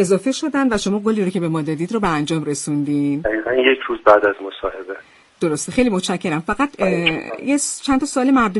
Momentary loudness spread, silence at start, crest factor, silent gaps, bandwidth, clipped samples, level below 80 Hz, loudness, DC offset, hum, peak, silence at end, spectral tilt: 9 LU; 0 s; 18 dB; none; 11.5 kHz; under 0.1%; -46 dBFS; -19 LUFS; under 0.1%; none; 0 dBFS; 0 s; -4.5 dB/octave